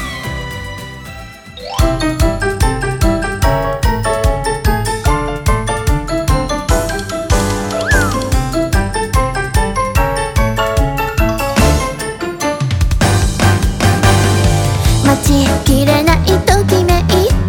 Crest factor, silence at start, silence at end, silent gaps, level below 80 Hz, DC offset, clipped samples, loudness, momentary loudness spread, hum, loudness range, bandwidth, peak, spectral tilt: 14 dB; 0 s; 0 s; none; -18 dBFS; under 0.1%; under 0.1%; -14 LUFS; 9 LU; none; 4 LU; 18.5 kHz; 0 dBFS; -5 dB/octave